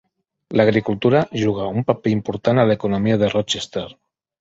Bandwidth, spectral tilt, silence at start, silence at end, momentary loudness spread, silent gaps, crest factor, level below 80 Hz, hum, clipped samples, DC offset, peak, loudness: 8 kHz; -6 dB/octave; 0.5 s; 0.5 s; 7 LU; none; 18 dB; -50 dBFS; none; under 0.1%; under 0.1%; 0 dBFS; -19 LUFS